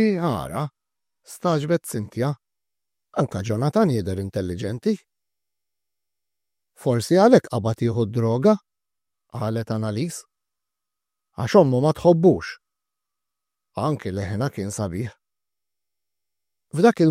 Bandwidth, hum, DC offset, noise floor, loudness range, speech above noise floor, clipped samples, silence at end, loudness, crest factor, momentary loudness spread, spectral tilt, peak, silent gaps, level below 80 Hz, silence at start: 15.5 kHz; none; under 0.1%; -89 dBFS; 8 LU; 68 dB; under 0.1%; 0 s; -22 LUFS; 22 dB; 15 LU; -7 dB/octave; -2 dBFS; none; -58 dBFS; 0 s